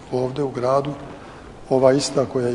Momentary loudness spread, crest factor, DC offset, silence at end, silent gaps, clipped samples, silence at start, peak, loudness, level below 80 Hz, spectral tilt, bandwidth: 22 LU; 20 dB; under 0.1%; 0 s; none; under 0.1%; 0 s; -2 dBFS; -20 LUFS; -50 dBFS; -5.5 dB/octave; 11 kHz